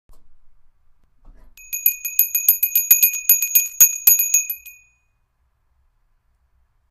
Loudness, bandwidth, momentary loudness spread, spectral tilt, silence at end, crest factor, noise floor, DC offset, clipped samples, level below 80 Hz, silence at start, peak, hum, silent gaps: -14 LUFS; 16.5 kHz; 8 LU; 3.5 dB/octave; 2.2 s; 20 dB; -66 dBFS; under 0.1%; under 0.1%; -54 dBFS; 0.15 s; 0 dBFS; none; none